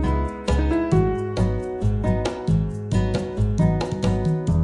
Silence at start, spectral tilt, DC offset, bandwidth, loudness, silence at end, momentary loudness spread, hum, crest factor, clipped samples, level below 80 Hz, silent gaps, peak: 0 s; -8 dB/octave; under 0.1%; 11 kHz; -23 LUFS; 0 s; 4 LU; none; 14 dB; under 0.1%; -28 dBFS; none; -6 dBFS